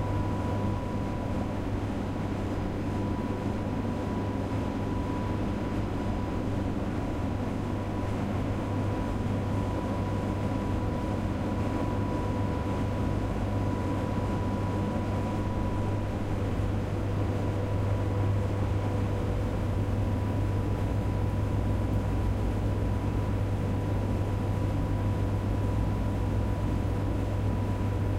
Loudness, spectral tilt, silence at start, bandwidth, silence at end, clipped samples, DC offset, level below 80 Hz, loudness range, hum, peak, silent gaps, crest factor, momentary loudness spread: -30 LUFS; -8 dB/octave; 0 s; 12 kHz; 0 s; under 0.1%; under 0.1%; -36 dBFS; 2 LU; none; -16 dBFS; none; 12 dB; 3 LU